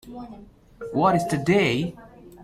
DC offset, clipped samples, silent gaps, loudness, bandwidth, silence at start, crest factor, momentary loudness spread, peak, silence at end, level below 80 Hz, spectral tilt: under 0.1%; under 0.1%; none; -22 LUFS; 15 kHz; 0.05 s; 18 dB; 20 LU; -8 dBFS; 0 s; -54 dBFS; -6 dB/octave